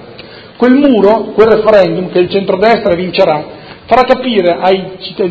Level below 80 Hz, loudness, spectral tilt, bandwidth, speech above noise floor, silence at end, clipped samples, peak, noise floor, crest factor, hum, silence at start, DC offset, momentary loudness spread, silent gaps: -42 dBFS; -10 LUFS; -7.5 dB/octave; 8 kHz; 23 dB; 0 s; 1%; 0 dBFS; -32 dBFS; 10 dB; none; 0 s; under 0.1%; 7 LU; none